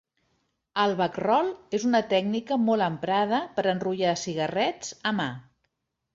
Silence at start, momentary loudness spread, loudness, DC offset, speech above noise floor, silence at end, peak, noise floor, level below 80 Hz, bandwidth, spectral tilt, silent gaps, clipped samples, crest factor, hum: 0.75 s; 6 LU; -26 LUFS; under 0.1%; 52 dB; 0.75 s; -8 dBFS; -78 dBFS; -68 dBFS; 7.8 kHz; -5 dB/octave; none; under 0.1%; 18 dB; none